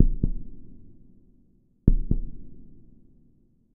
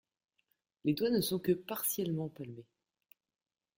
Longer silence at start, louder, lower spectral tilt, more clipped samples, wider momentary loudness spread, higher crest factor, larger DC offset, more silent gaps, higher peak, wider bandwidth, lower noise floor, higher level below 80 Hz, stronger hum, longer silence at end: second, 0 s vs 0.85 s; first, -29 LUFS vs -34 LUFS; first, -17.5 dB/octave vs -5 dB/octave; neither; first, 26 LU vs 16 LU; first, 26 dB vs 18 dB; neither; neither; first, 0 dBFS vs -18 dBFS; second, 0.8 kHz vs 17 kHz; second, -60 dBFS vs -80 dBFS; first, -30 dBFS vs -70 dBFS; neither; second, 0.95 s vs 1.15 s